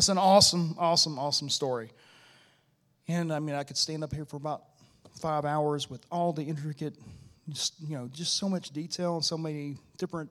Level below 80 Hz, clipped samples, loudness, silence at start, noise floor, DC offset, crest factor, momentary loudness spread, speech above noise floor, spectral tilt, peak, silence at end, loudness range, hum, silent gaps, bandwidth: -62 dBFS; under 0.1%; -29 LUFS; 0 s; -70 dBFS; under 0.1%; 22 dB; 16 LU; 40 dB; -3.5 dB/octave; -8 dBFS; 0 s; 7 LU; none; none; 15.5 kHz